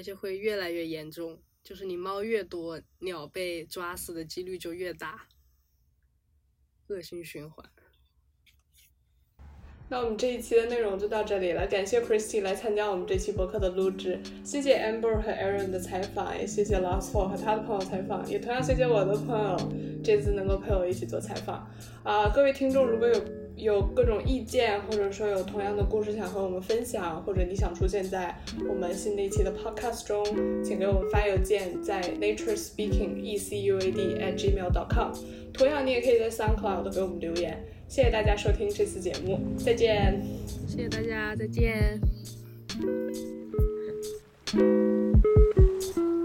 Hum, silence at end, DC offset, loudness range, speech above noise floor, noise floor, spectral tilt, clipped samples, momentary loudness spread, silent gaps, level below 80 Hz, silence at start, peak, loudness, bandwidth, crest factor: none; 0 s; under 0.1%; 11 LU; 41 dB; -69 dBFS; -6 dB/octave; under 0.1%; 13 LU; none; -36 dBFS; 0 s; -10 dBFS; -29 LUFS; 16 kHz; 18 dB